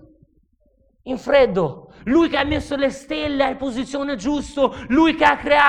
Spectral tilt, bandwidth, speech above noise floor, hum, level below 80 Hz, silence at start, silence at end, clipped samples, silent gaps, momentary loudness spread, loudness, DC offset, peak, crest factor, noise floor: -5 dB/octave; 10.5 kHz; 42 dB; none; -42 dBFS; 1.05 s; 0 s; under 0.1%; none; 10 LU; -20 LUFS; under 0.1%; -2 dBFS; 18 dB; -60 dBFS